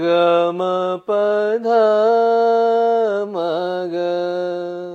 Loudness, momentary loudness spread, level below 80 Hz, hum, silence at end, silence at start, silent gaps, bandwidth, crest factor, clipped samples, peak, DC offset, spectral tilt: -17 LUFS; 7 LU; -86 dBFS; none; 0 s; 0 s; none; 8 kHz; 12 dB; under 0.1%; -4 dBFS; under 0.1%; -6.5 dB/octave